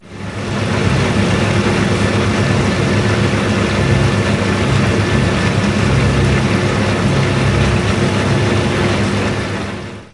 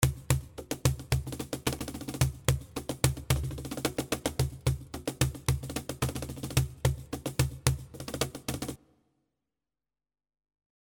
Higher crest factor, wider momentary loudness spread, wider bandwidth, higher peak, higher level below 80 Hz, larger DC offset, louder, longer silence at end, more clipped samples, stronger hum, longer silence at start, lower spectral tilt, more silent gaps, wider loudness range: second, 14 dB vs 32 dB; second, 4 LU vs 9 LU; second, 11.5 kHz vs over 20 kHz; about the same, 0 dBFS vs -2 dBFS; first, -28 dBFS vs -42 dBFS; neither; first, -15 LUFS vs -32 LUFS; second, 0.1 s vs 2.15 s; neither; neither; about the same, 0.05 s vs 0 s; first, -6 dB/octave vs -4.5 dB/octave; neither; second, 1 LU vs 4 LU